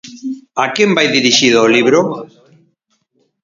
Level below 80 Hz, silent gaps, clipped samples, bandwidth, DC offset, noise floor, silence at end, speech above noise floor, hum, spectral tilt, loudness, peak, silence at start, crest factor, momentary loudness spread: -60 dBFS; none; under 0.1%; 7.6 kHz; under 0.1%; -63 dBFS; 1.15 s; 52 dB; none; -3 dB/octave; -11 LUFS; 0 dBFS; 0.05 s; 14 dB; 16 LU